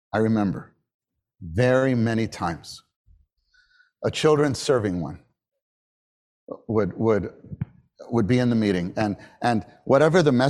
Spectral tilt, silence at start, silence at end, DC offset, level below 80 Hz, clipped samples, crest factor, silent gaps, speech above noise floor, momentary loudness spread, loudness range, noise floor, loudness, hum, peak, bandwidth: -6.5 dB/octave; 0.15 s; 0 s; under 0.1%; -54 dBFS; under 0.1%; 20 dB; 0.94-0.99 s, 2.96-3.05 s, 5.62-6.47 s; 42 dB; 16 LU; 4 LU; -64 dBFS; -23 LUFS; none; -4 dBFS; 12.5 kHz